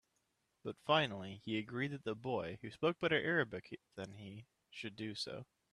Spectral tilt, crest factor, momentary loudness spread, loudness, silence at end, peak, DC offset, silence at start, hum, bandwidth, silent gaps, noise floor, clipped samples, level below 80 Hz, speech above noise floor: -5.5 dB/octave; 22 dB; 18 LU; -39 LUFS; 0.3 s; -18 dBFS; under 0.1%; 0.65 s; none; 12 kHz; none; -82 dBFS; under 0.1%; -76 dBFS; 42 dB